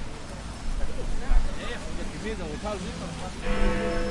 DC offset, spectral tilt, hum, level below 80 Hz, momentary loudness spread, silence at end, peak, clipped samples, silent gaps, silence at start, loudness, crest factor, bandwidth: under 0.1%; -5 dB/octave; none; -28 dBFS; 9 LU; 0 s; -8 dBFS; under 0.1%; none; 0 s; -32 LUFS; 18 dB; 11 kHz